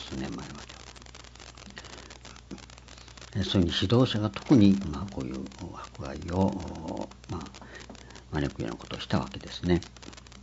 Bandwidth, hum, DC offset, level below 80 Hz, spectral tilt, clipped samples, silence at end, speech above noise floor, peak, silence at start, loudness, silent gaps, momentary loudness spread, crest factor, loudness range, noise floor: 8 kHz; none; under 0.1%; -50 dBFS; -6.5 dB/octave; under 0.1%; 0 s; 20 dB; -8 dBFS; 0 s; -29 LUFS; none; 22 LU; 22 dB; 9 LU; -48 dBFS